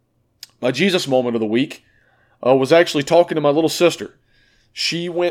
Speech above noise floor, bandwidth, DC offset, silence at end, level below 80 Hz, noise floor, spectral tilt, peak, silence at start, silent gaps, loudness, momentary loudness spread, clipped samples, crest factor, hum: 41 dB; 16 kHz; under 0.1%; 0 s; -64 dBFS; -57 dBFS; -4.5 dB/octave; 0 dBFS; 0.6 s; none; -17 LUFS; 12 LU; under 0.1%; 18 dB; none